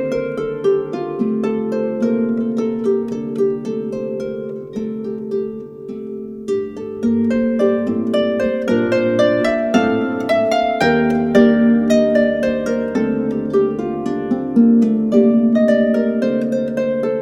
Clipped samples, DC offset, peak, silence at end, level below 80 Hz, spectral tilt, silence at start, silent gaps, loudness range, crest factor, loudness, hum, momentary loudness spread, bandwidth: under 0.1%; under 0.1%; 0 dBFS; 0 s; -50 dBFS; -7 dB/octave; 0 s; none; 8 LU; 16 dB; -17 LUFS; none; 11 LU; 8.4 kHz